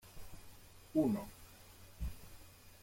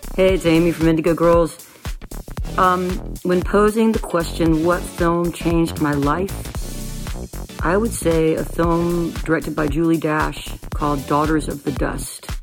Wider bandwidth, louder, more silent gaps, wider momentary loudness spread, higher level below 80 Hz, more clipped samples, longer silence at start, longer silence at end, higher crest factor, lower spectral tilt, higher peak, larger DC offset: about the same, 16.5 kHz vs 17.5 kHz; second, -39 LUFS vs -19 LUFS; neither; first, 24 LU vs 14 LU; second, -54 dBFS vs -30 dBFS; neither; about the same, 0.05 s vs 0 s; about the same, 0 s vs 0 s; about the same, 20 dB vs 16 dB; about the same, -7 dB/octave vs -6 dB/octave; second, -22 dBFS vs -2 dBFS; neither